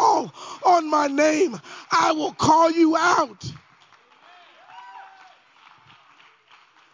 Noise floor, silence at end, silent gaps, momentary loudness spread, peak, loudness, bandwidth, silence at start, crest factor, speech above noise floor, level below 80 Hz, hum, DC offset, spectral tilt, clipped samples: -55 dBFS; 1.95 s; none; 20 LU; -4 dBFS; -20 LUFS; 7.6 kHz; 0 s; 18 dB; 35 dB; -60 dBFS; none; under 0.1%; -4 dB/octave; under 0.1%